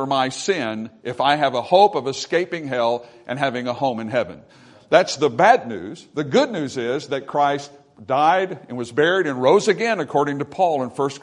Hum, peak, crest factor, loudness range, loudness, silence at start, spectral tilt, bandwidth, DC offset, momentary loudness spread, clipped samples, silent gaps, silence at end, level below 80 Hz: none; 0 dBFS; 20 dB; 2 LU; -20 LUFS; 0 s; -4.5 dB/octave; 11 kHz; under 0.1%; 13 LU; under 0.1%; none; 0.05 s; -66 dBFS